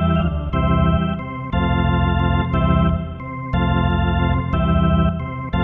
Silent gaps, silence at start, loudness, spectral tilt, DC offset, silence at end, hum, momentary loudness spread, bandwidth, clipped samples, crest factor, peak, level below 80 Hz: none; 0 s; -19 LUFS; -10 dB/octave; under 0.1%; 0 s; none; 7 LU; 3.8 kHz; under 0.1%; 14 dB; -4 dBFS; -24 dBFS